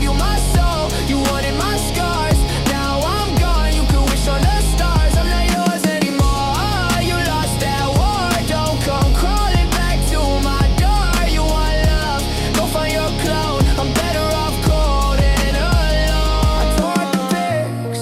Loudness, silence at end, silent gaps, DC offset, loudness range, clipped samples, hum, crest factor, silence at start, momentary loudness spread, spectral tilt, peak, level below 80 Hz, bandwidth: -17 LUFS; 0 s; none; under 0.1%; 1 LU; under 0.1%; none; 12 dB; 0 s; 2 LU; -5 dB/octave; -4 dBFS; -18 dBFS; 16 kHz